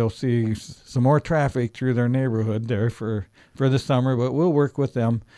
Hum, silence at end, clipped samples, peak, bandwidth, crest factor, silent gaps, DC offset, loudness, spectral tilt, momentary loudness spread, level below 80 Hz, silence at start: none; 0.15 s; under 0.1%; -6 dBFS; 11 kHz; 16 dB; none; under 0.1%; -23 LUFS; -8 dB/octave; 9 LU; -50 dBFS; 0 s